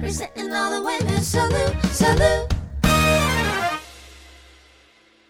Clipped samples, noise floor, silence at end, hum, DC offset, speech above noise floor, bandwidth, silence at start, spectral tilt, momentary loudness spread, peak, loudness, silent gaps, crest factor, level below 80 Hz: under 0.1%; -55 dBFS; 1.05 s; none; under 0.1%; 35 dB; 18.5 kHz; 0 s; -4.5 dB/octave; 11 LU; -4 dBFS; -20 LUFS; none; 18 dB; -32 dBFS